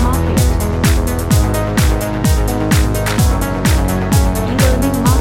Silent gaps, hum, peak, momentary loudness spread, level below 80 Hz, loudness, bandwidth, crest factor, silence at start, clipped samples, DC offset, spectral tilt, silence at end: none; none; 0 dBFS; 2 LU; -18 dBFS; -14 LUFS; 17 kHz; 12 dB; 0 s; under 0.1%; under 0.1%; -5.5 dB/octave; 0 s